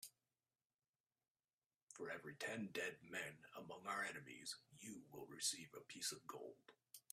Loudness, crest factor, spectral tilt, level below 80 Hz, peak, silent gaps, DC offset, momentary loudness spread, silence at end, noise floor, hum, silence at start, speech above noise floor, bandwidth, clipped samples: -50 LUFS; 24 dB; -2 dB/octave; under -90 dBFS; -30 dBFS; 0.65-0.79 s, 0.89-0.93 s, 1.00-1.04 s, 1.31-1.35 s, 1.53-1.58 s, 1.66-1.70 s, 1.83-1.87 s; under 0.1%; 15 LU; 0.1 s; under -90 dBFS; none; 0 s; over 39 dB; 15.5 kHz; under 0.1%